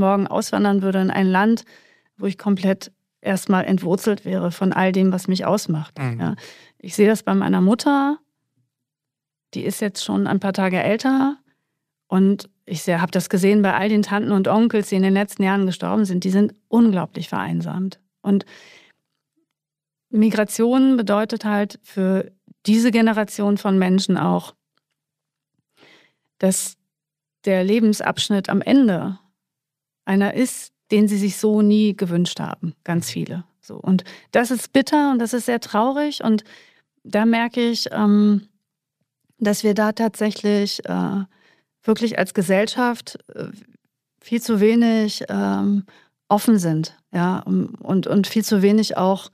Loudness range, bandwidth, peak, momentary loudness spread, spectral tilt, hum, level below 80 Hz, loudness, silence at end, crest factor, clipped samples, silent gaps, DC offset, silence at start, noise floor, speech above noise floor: 4 LU; 15.5 kHz; -2 dBFS; 11 LU; -6 dB/octave; none; -68 dBFS; -20 LUFS; 0.05 s; 18 dB; under 0.1%; none; under 0.1%; 0 s; -87 dBFS; 68 dB